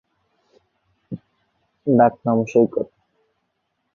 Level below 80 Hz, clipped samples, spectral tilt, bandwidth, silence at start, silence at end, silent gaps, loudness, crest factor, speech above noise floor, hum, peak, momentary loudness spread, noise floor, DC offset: -64 dBFS; under 0.1%; -9 dB/octave; 7 kHz; 1.1 s; 1.1 s; none; -19 LUFS; 20 dB; 56 dB; none; -2 dBFS; 21 LU; -73 dBFS; under 0.1%